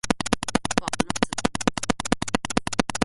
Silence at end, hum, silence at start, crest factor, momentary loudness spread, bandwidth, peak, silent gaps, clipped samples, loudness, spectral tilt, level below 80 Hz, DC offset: 0 s; none; 0.05 s; 22 dB; 2 LU; 12 kHz; -4 dBFS; none; under 0.1%; -25 LUFS; -3.5 dB/octave; -44 dBFS; under 0.1%